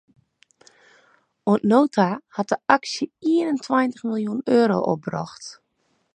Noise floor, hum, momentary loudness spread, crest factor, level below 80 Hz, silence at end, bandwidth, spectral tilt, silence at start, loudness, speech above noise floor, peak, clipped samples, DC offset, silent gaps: -69 dBFS; none; 12 LU; 22 dB; -68 dBFS; 0.6 s; 9.8 kHz; -6 dB/octave; 1.45 s; -22 LUFS; 48 dB; 0 dBFS; under 0.1%; under 0.1%; none